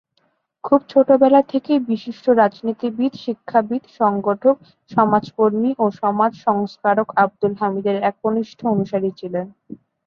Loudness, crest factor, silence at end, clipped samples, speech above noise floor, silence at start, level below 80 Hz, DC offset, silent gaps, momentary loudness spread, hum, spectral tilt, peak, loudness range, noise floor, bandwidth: -19 LUFS; 18 dB; 0.3 s; under 0.1%; 48 dB; 0.65 s; -64 dBFS; under 0.1%; none; 9 LU; none; -8.5 dB/octave; -2 dBFS; 3 LU; -66 dBFS; 6.6 kHz